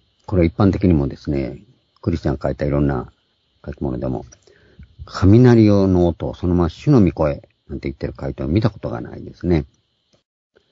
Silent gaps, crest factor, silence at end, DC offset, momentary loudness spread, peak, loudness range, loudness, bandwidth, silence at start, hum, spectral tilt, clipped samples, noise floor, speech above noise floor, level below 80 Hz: none; 18 dB; 1.05 s; under 0.1%; 17 LU; 0 dBFS; 8 LU; -18 LUFS; 7.6 kHz; 0.3 s; none; -9 dB/octave; under 0.1%; -58 dBFS; 41 dB; -36 dBFS